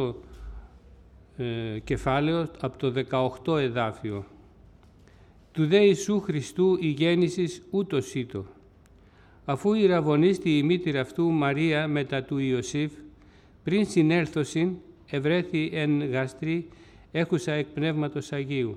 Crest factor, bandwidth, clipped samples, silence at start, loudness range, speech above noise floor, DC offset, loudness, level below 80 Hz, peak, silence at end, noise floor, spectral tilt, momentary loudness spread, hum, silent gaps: 18 dB; 12.5 kHz; under 0.1%; 0 s; 4 LU; 30 dB; under 0.1%; -26 LUFS; -52 dBFS; -8 dBFS; 0 s; -55 dBFS; -6.5 dB/octave; 12 LU; none; none